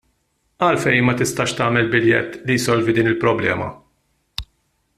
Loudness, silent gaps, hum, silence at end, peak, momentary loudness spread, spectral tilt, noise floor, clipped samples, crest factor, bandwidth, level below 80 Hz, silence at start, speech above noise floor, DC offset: -18 LUFS; none; none; 0.55 s; -2 dBFS; 15 LU; -5 dB/octave; -67 dBFS; under 0.1%; 18 dB; 14.5 kHz; -48 dBFS; 0.6 s; 49 dB; under 0.1%